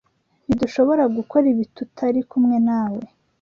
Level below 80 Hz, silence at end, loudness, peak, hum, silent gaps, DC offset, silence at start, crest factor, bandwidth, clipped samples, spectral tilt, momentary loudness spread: -54 dBFS; 0.35 s; -20 LUFS; -6 dBFS; none; none; under 0.1%; 0.5 s; 16 dB; 7 kHz; under 0.1%; -8 dB/octave; 10 LU